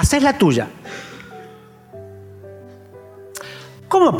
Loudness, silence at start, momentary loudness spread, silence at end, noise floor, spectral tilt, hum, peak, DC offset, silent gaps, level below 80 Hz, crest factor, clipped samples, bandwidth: -17 LUFS; 0 s; 26 LU; 0 s; -43 dBFS; -5.5 dB/octave; none; -4 dBFS; under 0.1%; none; -38 dBFS; 18 dB; under 0.1%; 16.5 kHz